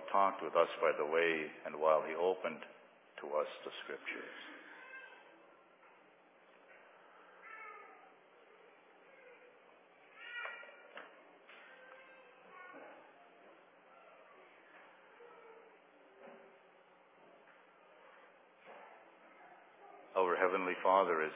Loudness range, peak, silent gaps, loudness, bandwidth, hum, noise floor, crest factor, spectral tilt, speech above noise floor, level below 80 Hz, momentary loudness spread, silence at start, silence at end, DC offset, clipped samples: 24 LU; -16 dBFS; none; -36 LUFS; 3.9 kHz; none; -65 dBFS; 26 dB; -1.5 dB/octave; 29 dB; under -90 dBFS; 28 LU; 0 s; 0 s; under 0.1%; under 0.1%